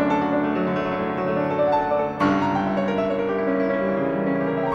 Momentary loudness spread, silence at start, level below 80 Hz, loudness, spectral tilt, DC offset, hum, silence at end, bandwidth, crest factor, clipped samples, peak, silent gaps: 3 LU; 0 s; -52 dBFS; -22 LUFS; -8 dB/octave; under 0.1%; none; 0 s; 7.4 kHz; 14 dB; under 0.1%; -8 dBFS; none